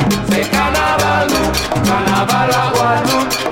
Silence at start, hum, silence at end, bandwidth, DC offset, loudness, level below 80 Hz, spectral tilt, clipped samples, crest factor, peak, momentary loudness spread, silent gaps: 0 s; none; 0 s; 17 kHz; under 0.1%; -14 LUFS; -32 dBFS; -4 dB/octave; under 0.1%; 12 dB; -2 dBFS; 2 LU; none